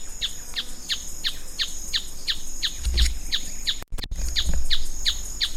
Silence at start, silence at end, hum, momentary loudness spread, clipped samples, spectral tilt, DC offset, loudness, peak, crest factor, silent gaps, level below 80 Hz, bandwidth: 0 s; 0 s; none; 7 LU; under 0.1%; -1 dB/octave; under 0.1%; -27 LUFS; -6 dBFS; 16 dB; none; -28 dBFS; 15.5 kHz